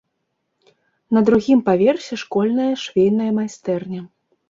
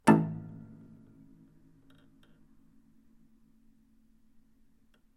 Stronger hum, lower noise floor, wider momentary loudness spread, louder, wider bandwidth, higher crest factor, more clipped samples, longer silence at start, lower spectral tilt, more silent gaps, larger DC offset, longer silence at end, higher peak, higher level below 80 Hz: neither; first, -73 dBFS vs -64 dBFS; second, 10 LU vs 32 LU; first, -18 LUFS vs -30 LUFS; second, 7.6 kHz vs 14 kHz; second, 16 dB vs 28 dB; neither; first, 1.1 s vs 0.05 s; about the same, -6.5 dB/octave vs -7 dB/octave; neither; neither; second, 0.45 s vs 4.55 s; first, -4 dBFS vs -8 dBFS; first, -56 dBFS vs -68 dBFS